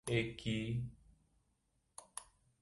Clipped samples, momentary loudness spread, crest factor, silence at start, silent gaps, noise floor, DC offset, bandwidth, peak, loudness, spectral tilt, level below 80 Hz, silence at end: under 0.1%; 18 LU; 22 dB; 0.05 s; none; -80 dBFS; under 0.1%; 11.5 kHz; -20 dBFS; -42 LUFS; -5 dB/octave; -62 dBFS; 0.4 s